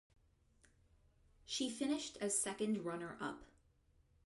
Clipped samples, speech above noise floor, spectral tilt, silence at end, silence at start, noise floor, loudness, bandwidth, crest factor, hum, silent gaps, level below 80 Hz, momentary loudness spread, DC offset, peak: under 0.1%; 32 dB; -3 dB/octave; 0.8 s; 1.45 s; -73 dBFS; -41 LUFS; 11.5 kHz; 20 dB; none; none; -72 dBFS; 9 LU; under 0.1%; -26 dBFS